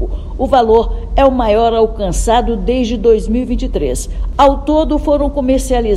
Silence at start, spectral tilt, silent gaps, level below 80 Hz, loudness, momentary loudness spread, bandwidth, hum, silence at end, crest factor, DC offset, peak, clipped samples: 0 s; -6 dB/octave; none; -20 dBFS; -13 LUFS; 7 LU; 13 kHz; none; 0 s; 12 dB; under 0.1%; 0 dBFS; 0.2%